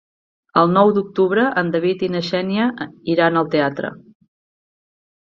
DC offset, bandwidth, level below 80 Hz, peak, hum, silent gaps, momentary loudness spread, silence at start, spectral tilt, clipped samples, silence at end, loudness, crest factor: under 0.1%; 7.2 kHz; -62 dBFS; -2 dBFS; none; none; 7 LU; 0.55 s; -7.5 dB/octave; under 0.1%; 1.3 s; -18 LUFS; 18 dB